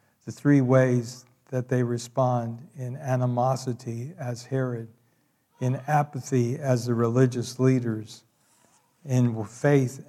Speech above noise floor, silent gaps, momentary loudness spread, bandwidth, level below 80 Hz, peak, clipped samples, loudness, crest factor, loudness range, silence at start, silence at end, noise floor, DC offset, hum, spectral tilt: 43 dB; none; 14 LU; 13 kHz; -74 dBFS; -8 dBFS; under 0.1%; -26 LUFS; 18 dB; 4 LU; 0.25 s; 0.05 s; -68 dBFS; under 0.1%; none; -7.5 dB/octave